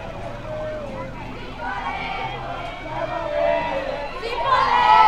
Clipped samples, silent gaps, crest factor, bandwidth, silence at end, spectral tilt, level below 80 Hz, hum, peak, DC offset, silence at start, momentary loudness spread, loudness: under 0.1%; none; 20 dB; 10.5 kHz; 0 s; -5 dB/octave; -40 dBFS; none; -2 dBFS; under 0.1%; 0 s; 14 LU; -24 LUFS